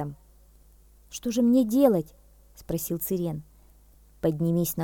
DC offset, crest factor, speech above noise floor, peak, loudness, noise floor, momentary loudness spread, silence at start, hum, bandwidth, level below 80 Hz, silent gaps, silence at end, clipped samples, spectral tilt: under 0.1%; 20 dB; 31 dB; -8 dBFS; -26 LUFS; -55 dBFS; 17 LU; 0 s; none; 19 kHz; -54 dBFS; none; 0 s; under 0.1%; -7 dB/octave